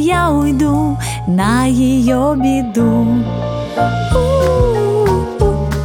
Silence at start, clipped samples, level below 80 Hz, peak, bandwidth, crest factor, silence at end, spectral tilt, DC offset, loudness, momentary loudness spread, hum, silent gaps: 0 s; under 0.1%; -26 dBFS; 0 dBFS; 17.5 kHz; 12 dB; 0 s; -7 dB/octave; under 0.1%; -14 LUFS; 4 LU; none; none